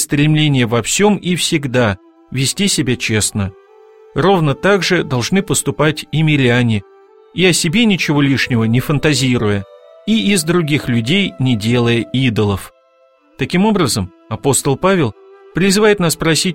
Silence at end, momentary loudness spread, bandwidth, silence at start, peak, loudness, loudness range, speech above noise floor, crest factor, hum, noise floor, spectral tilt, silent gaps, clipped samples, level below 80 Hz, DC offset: 0 s; 8 LU; 16.5 kHz; 0 s; 0 dBFS; -14 LUFS; 2 LU; 38 dB; 14 dB; none; -52 dBFS; -4.5 dB/octave; none; under 0.1%; -42 dBFS; 0.3%